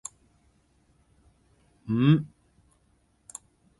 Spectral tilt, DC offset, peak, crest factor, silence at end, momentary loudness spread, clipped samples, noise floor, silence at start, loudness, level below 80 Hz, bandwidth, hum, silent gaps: -7 dB/octave; under 0.1%; -8 dBFS; 22 dB; 1.55 s; 23 LU; under 0.1%; -67 dBFS; 1.85 s; -24 LUFS; -62 dBFS; 11.5 kHz; none; none